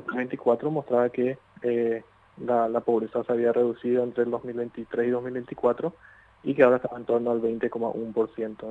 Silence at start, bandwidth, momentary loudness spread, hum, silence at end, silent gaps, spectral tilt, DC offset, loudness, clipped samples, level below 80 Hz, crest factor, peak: 0 s; 4.1 kHz; 9 LU; none; 0 s; none; -9 dB/octave; under 0.1%; -26 LUFS; under 0.1%; -66 dBFS; 20 dB; -6 dBFS